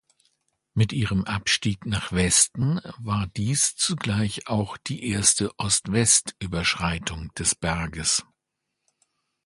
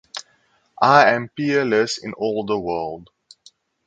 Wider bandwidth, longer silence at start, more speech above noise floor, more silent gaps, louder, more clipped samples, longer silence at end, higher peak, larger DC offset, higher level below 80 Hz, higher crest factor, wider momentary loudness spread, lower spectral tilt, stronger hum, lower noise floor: first, 12 kHz vs 9.2 kHz; first, 0.75 s vs 0.15 s; first, 57 dB vs 43 dB; neither; second, -23 LUFS vs -19 LUFS; neither; first, 1.25 s vs 0.85 s; second, -4 dBFS vs 0 dBFS; neither; first, -44 dBFS vs -60 dBFS; about the same, 22 dB vs 20 dB; second, 10 LU vs 19 LU; second, -3 dB/octave vs -4.5 dB/octave; neither; first, -81 dBFS vs -62 dBFS